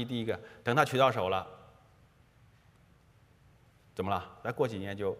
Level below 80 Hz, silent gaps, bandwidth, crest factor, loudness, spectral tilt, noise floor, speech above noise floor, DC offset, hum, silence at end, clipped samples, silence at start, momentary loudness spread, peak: -68 dBFS; none; 15.5 kHz; 26 dB; -31 LUFS; -5.5 dB/octave; -63 dBFS; 31 dB; under 0.1%; none; 0 s; under 0.1%; 0 s; 13 LU; -8 dBFS